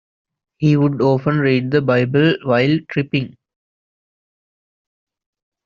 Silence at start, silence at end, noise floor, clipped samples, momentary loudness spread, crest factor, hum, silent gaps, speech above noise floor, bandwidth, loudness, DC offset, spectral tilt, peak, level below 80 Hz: 0.6 s; 2.4 s; under -90 dBFS; under 0.1%; 5 LU; 16 dB; none; none; over 74 dB; 7 kHz; -17 LUFS; under 0.1%; -6 dB/octave; -2 dBFS; -56 dBFS